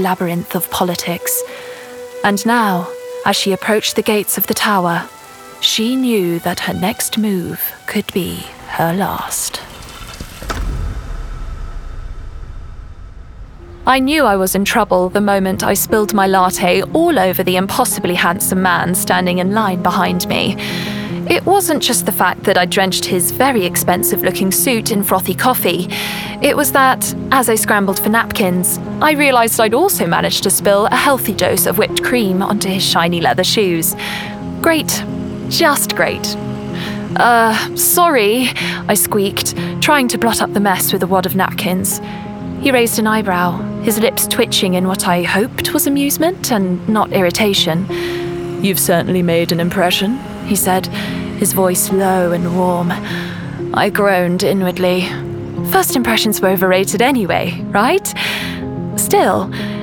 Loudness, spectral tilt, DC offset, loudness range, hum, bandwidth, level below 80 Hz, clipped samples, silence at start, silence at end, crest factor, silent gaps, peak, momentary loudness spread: -14 LUFS; -3.5 dB/octave; under 0.1%; 5 LU; none; over 20 kHz; -38 dBFS; under 0.1%; 0 s; 0 s; 14 dB; none; 0 dBFS; 10 LU